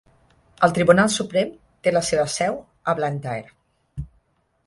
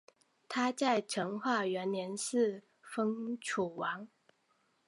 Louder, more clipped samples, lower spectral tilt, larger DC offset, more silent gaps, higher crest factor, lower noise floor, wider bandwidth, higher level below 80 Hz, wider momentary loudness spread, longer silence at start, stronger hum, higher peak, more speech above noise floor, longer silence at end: first, -21 LUFS vs -35 LUFS; neither; about the same, -4.5 dB/octave vs -4 dB/octave; neither; neither; about the same, 20 dB vs 20 dB; second, -66 dBFS vs -75 dBFS; about the same, 11.5 kHz vs 11.5 kHz; first, -50 dBFS vs -82 dBFS; first, 21 LU vs 9 LU; about the same, 0.6 s vs 0.5 s; neither; first, -2 dBFS vs -16 dBFS; first, 45 dB vs 41 dB; second, 0.6 s vs 0.8 s